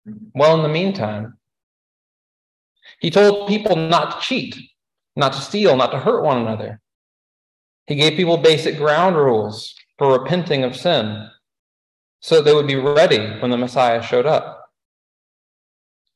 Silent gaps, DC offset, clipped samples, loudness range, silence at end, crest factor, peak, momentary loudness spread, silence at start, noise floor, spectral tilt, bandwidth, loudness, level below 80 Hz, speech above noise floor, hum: 1.63-2.75 s, 6.95-7.86 s, 11.59-12.19 s; under 0.1%; under 0.1%; 3 LU; 1.6 s; 18 dB; -2 dBFS; 16 LU; 0.05 s; under -90 dBFS; -5.5 dB/octave; 12 kHz; -17 LUFS; -60 dBFS; over 73 dB; none